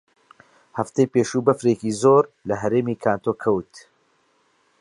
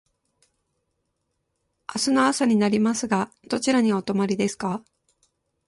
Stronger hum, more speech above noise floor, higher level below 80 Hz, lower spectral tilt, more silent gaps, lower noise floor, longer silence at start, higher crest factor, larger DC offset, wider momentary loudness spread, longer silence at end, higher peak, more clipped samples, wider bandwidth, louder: neither; second, 43 dB vs 54 dB; first, -60 dBFS vs -66 dBFS; first, -6.5 dB/octave vs -4.5 dB/octave; neither; second, -64 dBFS vs -76 dBFS; second, 0.75 s vs 1.9 s; about the same, 20 dB vs 18 dB; neither; about the same, 9 LU vs 10 LU; first, 1 s vs 0.85 s; first, -2 dBFS vs -6 dBFS; neither; about the same, 11.5 kHz vs 11.5 kHz; about the same, -21 LUFS vs -23 LUFS